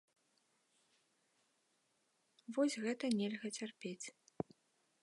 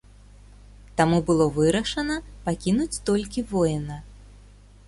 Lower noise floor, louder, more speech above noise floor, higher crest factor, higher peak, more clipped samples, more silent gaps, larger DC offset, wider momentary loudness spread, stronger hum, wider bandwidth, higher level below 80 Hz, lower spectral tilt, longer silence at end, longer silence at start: first, -80 dBFS vs -49 dBFS; second, -41 LUFS vs -24 LUFS; first, 40 dB vs 26 dB; about the same, 22 dB vs 18 dB; second, -22 dBFS vs -6 dBFS; neither; neither; neither; about the same, 12 LU vs 11 LU; second, none vs 50 Hz at -40 dBFS; about the same, 11.5 kHz vs 11.5 kHz; second, -86 dBFS vs -44 dBFS; about the same, -4.5 dB/octave vs -5.5 dB/octave; first, 0.95 s vs 0.5 s; first, 2.5 s vs 0.95 s